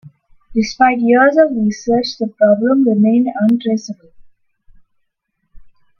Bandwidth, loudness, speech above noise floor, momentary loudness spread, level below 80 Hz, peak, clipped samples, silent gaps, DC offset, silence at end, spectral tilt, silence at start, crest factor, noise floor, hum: 7 kHz; -14 LUFS; 57 dB; 11 LU; -52 dBFS; 0 dBFS; under 0.1%; none; under 0.1%; 0.35 s; -6 dB/octave; 0.05 s; 16 dB; -70 dBFS; none